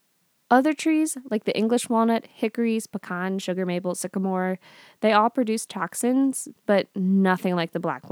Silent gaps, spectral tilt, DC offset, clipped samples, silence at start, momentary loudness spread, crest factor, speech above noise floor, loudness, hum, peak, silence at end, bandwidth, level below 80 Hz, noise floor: none; -5 dB/octave; under 0.1%; under 0.1%; 0.5 s; 9 LU; 20 dB; 45 dB; -24 LUFS; none; -4 dBFS; 0 s; 18 kHz; -84 dBFS; -68 dBFS